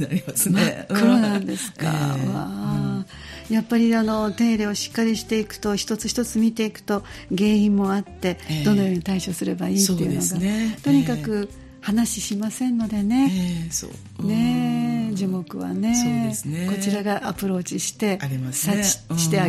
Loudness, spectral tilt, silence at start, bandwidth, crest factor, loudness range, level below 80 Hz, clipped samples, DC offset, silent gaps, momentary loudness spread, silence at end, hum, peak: -22 LUFS; -5 dB/octave; 0 s; 15.5 kHz; 18 dB; 2 LU; -50 dBFS; under 0.1%; under 0.1%; none; 8 LU; 0 s; none; -4 dBFS